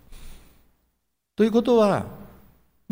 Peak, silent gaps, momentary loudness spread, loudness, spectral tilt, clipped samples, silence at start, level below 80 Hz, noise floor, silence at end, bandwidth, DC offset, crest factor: -8 dBFS; none; 20 LU; -21 LUFS; -7 dB/octave; under 0.1%; 0.1 s; -50 dBFS; -75 dBFS; 0.65 s; 16 kHz; under 0.1%; 18 dB